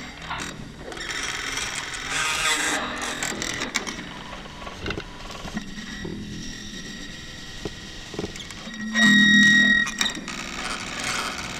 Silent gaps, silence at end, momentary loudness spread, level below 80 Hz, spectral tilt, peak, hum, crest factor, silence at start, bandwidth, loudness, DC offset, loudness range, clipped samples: none; 0 s; 21 LU; -46 dBFS; -2 dB/octave; -4 dBFS; none; 20 dB; 0 s; 16.5 kHz; -22 LUFS; under 0.1%; 15 LU; under 0.1%